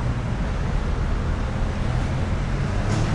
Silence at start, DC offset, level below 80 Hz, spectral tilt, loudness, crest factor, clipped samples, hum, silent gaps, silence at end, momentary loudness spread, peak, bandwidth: 0 s; under 0.1%; -26 dBFS; -7 dB/octave; -26 LUFS; 12 dB; under 0.1%; none; none; 0 s; 2 LU; -10 dBFS; 11 kHz